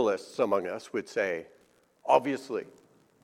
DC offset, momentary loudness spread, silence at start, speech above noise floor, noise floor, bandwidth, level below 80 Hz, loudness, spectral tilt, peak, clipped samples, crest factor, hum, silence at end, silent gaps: under 0.1%; 12 LU; 0 s; 26 dB; -55 dBFS; 13.5 kHz; -78 dBFS; -30 LUFS; -5 dB/octave; -8 dBFS; under 0.1%; 24 dB; none; 0.6 s; none